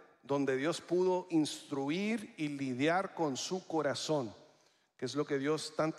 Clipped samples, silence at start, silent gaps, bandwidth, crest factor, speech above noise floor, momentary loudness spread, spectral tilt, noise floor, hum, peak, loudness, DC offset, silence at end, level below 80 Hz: under 0.1%; 0 s; none; 13.5 kHz; 18 dB; 35 dB; 6 LU; -5 dB/octave; -69 dBFS; none; -18 dBFS; -35 LUFS; under 0.1%; 0 s; -84 dBFS